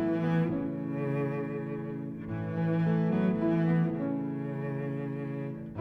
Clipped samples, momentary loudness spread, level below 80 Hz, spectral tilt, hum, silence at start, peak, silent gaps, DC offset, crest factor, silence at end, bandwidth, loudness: under 0.1%; 9 LU; -62 dBFS; -10.5 dB/octave; none; 0 s; -16 dBFS; none; under 0.1%; 14 dB; 0 s; 4.5 kHz; -31 LUFS